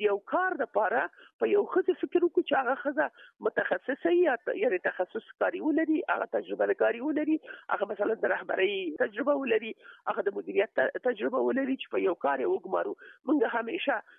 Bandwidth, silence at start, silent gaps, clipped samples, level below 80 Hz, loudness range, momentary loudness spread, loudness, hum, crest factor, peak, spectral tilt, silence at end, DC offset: 3.9 kHz; 0 s; 1.33-1.39 s; under 0.1%; -82 dBFS; 1 LU; 6 LU; -29 LUFS; none; 16 dB; -14 dBFS; -8 dB/octave; 0.15 s; under 0.1%